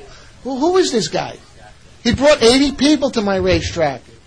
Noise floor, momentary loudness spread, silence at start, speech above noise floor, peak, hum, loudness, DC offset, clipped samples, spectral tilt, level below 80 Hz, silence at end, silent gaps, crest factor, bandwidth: -43 dBFS; 12 LU; 0 s; 27 dB; -2 dBFS; none; -15 LUFS; 0.3%; under 0.1%; -4.5 dB/octave; -36 dBFS; 0.3 s; none; 14 dB; 10.5 kHz